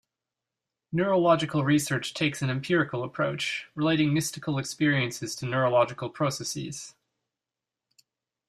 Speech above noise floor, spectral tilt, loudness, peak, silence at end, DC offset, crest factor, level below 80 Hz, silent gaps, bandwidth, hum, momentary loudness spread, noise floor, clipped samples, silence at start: 63 dB; -5 dB/octave; -27 LUFS; -8 dBFS; 1.6 s; under 0.1%; 20 dB; -66 dBFS; none; 15 kHz; none; 9 LU; -89 dBFS; under 0.1%; 0.9 s